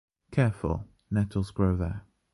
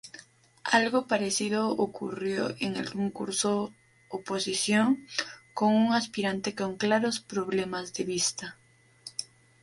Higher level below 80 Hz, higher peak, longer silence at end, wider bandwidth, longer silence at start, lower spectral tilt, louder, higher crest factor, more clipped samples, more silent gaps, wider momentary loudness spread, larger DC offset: first, -42 dBFS vs -70 dBFS; about the same, -12 dBFS vs -10 dBFS; about the same, 0.35 s vs 0.4 s; about the same, 11.5 kHz vs 11.5 kHz; first, 0.3 s vs 0.05 s; first, -8.5 dB/octave vs -3.5 dB/octave; about the same, -29 LUFS vs -29 LUFS; about the same, 16 dB vs 20 dB; neither; neither; second, 8 LU vs 14 LU; neither